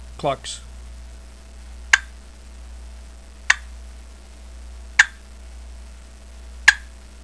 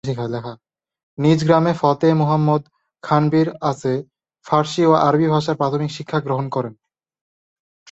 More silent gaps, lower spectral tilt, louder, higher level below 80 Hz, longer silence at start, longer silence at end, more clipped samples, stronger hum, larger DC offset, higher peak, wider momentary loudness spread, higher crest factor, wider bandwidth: second, none vs 1.03-1.17 s; second, -1 dB/octave vs -7.5 dB/octave; about the same, -19 LUFS vs -18 LUFS; first, -40 dBFS vs -58 dBFS; about the same, 0 s vs 0.05 s; second, 0 s vs 1.2 s; neither; neither; first, 0.3% vs under 0.1%; about the same, 0 dBFS vs -2 dBFS; first, 27 LU vs 11 LU; first, 26 dB vs 18 dB; first, 11 kHz vs 8 kHz